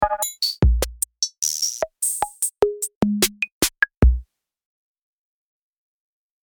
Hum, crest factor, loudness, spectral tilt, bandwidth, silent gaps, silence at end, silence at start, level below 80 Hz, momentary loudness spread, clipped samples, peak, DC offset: none; 20 dB; -22 LUFS; -3.5 dB/octave; over 20 kHz; 2.95-3.01 s, 3.52-3.61 s; 2.25 s; 0 s; -28 dBFS; 5 LU; under 0.1%; -4 dBFS; under 0.1%